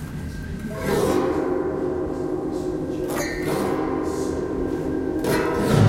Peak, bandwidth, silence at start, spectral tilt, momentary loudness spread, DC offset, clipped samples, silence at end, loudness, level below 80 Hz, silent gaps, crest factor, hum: -4 dBFS; 16 kHz; 0 s; -6.5 dB/octave; 7 LU; under 0.1%; under 0.1%; 0 s; -25 LUFS; -40 dBFS; none; 18 dB; none